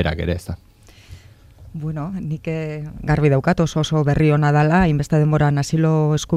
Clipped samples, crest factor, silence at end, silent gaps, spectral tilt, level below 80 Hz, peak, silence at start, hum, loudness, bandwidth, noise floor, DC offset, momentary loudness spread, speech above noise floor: under 0.1%; 16 dB; 0 s; none; -7 dB/octave; -38 dBFS; -2 dBFS; 0 s; none; -19 LUFS; 10.5 kHz; -44 dBFS; under 0.1%; 13 LU; 27 dB